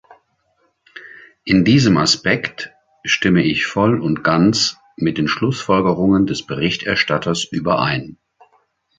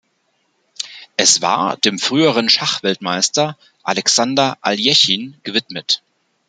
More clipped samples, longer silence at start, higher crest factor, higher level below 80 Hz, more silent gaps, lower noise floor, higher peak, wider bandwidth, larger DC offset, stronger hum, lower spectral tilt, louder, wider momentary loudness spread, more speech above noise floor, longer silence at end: neither; first, 0.95 s vs 0.8 s; about the same, 16 dB vs 18 dB; first, -48 dBFS vs -66 dBFS; neither; about the same, -64 dBFS vs -65 dBFS; about the same, -2 dBFS vs 0 dBFS; second, 9.4 kHz vs 12 kHz; neither; neither; first, -5 dB/octave vs -2 dB/octave; about the same, -16 LUFS vs -15 LUFS; first, 13 LU vs 10 LU; about the same, 48 dB vs 48 dB; first, 0.85 s vs 0.5 s